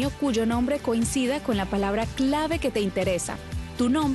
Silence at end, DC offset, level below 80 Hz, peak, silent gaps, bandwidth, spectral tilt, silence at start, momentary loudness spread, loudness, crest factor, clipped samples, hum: 0 s; under 0.1%; -40 dBFS; -12 dBFS; none; 12.5 kHz; -5 dB/octave; 0 s; 4 LU; -26 LUFS; 12 dB; under 0.1%; none